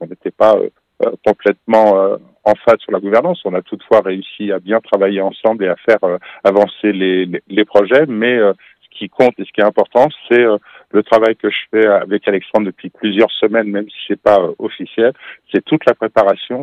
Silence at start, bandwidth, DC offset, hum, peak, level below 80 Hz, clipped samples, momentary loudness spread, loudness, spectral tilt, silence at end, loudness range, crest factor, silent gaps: 0 s; 7.8 kHz; under 0.1%; none; 0 dBFS; -58 dBFS; 0.1%; 9 LU; -14 LUFS; -7 dB/octave; 0 s; 2 LU; 14 dB; none